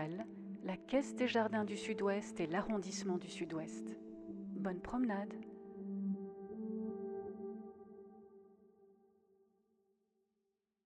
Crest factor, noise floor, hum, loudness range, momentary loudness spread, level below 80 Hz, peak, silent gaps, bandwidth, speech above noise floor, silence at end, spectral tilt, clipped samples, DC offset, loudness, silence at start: 20 dB; -87 dBFS; none; 12 LU; 14 LU; -70 dBFS; -22 dBFS; none; 10.5 kHz; 47 dB; 2 s; -5.5 dB/octave; under 0.1%; under 0.1%; -41 LUFS; 0 s